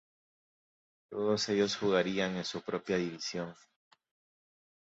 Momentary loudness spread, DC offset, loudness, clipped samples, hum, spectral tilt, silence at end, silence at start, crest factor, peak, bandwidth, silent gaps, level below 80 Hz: 9 LU; under 0.1%; -33 LUFS; under 0.1%; none; -4.5 dB/octave; 1.3 s; 1.1 s; 22 dB; -14 dBFS; 8 kHz; none; -72 dBFS